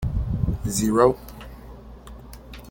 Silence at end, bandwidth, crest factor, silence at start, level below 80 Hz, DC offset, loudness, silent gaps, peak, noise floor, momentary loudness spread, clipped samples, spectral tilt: 0 s; 17 kHz; 22 dB; 0 s; -34 dBFS; under 0.1%; -22 LUFS; none; -2 dBFS; -42 dBFS; 25 LU; under 0.1%; -6 dB/octave